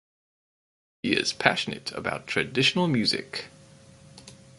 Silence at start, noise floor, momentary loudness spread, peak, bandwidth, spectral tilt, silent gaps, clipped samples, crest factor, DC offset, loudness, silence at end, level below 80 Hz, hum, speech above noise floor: 1.05 s; -52 dBFS; 13 LU; 0 dBFS; 11.5 kHz; -4 dB/octave; none; under 0.1%; 28 dB; under 0.1%; -25 LUFS; 0.25 s; -62 dBFS; none; 25 dB